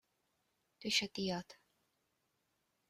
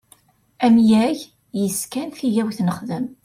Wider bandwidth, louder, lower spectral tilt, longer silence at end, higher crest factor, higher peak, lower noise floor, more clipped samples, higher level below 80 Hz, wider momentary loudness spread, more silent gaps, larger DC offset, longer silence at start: about the same, 15.5 kHz vs 16 kHz; second, -38 LUFS vs -20 LUFS; second, -3 dB/octave vs -5.5 dB/octave; first, 1.35 s vs 0.1 s; first, 26 dB vs 14 dB; second, -18 dBFS vs -6 dBFS; first, -83 dBFS vs -55 dBFS; neither; second, -78 dBFS vs -60 dBFS; about the same, 14 LU vs 13 LU; neither; neither; first, 0.8 s vs 0.6 s